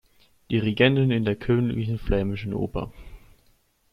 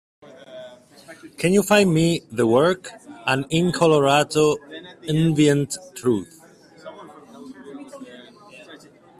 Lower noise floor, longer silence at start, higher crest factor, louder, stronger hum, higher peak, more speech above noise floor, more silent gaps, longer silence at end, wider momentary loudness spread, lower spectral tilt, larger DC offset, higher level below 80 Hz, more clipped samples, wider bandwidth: first, -63 dBFS vs -47 dBFS; about the same, 0.5 s vs 0.5 s; about the same, 20 dB vs 18 dB; second, -24 LUFS vs -20 LUFS; neither; about the same, -4 dBFS vs -4 dBFS; first, 40 dB vs 28 dB; neither; first, 0.75 s vs 0.45 s; second, 10 LU vs 24 LU; first, -8.5 dB/octave vs -5.5 dB/octave; neither; first, -40 dBFS vs -56 dBFS; neither; second, 5.8 kHz vs 15 kHz